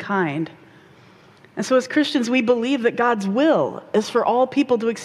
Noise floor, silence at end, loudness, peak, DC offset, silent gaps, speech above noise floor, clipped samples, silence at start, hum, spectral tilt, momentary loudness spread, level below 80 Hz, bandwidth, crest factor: -49 dBFS; 0 s; -20 LUFS; -6 dBFS; under 0.1%; none; 30 dB; under 0.1%; 0 s; none; -5 dB/octave; 7 LU; -66 dBFS; 12.5 kHz; 14 dB